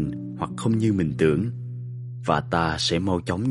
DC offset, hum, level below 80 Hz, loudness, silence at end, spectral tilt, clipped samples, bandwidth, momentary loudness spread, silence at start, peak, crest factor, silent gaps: under 0.1%; none; -48 dBFS; -24 LUFS; 0 s; -6 dB/octave; under 0.1%; 11.5 kHz; 12 LU; 0 s; -4 dBFS; 20 dB; none